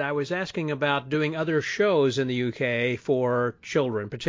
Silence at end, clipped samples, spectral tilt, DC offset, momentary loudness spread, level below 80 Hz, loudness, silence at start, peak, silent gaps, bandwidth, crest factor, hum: 0 s; under 0.1%; -6 dB/octave; under 0.1%; 5 LU; -62 dBFS; -25 LUFS; 0 s; -10 dBFS; none; 7.6 kHz; 16 dB; none